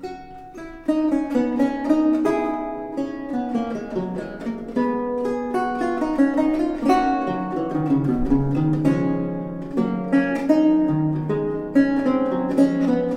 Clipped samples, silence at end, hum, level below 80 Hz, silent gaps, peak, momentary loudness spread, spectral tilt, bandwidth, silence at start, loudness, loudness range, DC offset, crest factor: under 0.1%; 0 s; none; -42 dBFS; none; -6 dBFS; 10 LU; -8.5 dB/octave; 10 kHz; 0 s; -22 LUFS; 4 LU; under 0.1%; 16 dB